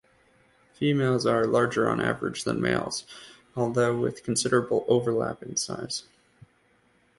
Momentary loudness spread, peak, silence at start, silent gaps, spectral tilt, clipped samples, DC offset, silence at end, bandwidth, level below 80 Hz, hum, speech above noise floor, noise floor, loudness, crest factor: 10 LU; -8 dBFS; 0.8 s; none; -4.5 dB/octave; under 0.1%; under 0.1%; 1.15 s; 11.5 kHz; -60 dBFS; none; 39 dB; -65 dBFS; -26 LUFS; 20 dB